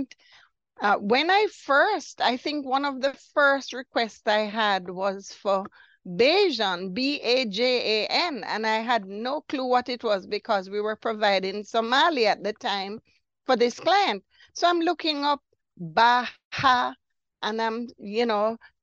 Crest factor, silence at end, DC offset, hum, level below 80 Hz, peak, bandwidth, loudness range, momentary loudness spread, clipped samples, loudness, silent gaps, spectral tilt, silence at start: 18 dB; 0.25 s; under 0.1%; none; -70 dBFS; -6 dBFS; 8.2 kHz; 2 LU; 10 LU; under 0.1%; -24 LUFS; 16.45-16.51 s; -3.5 dB/octave; 0 s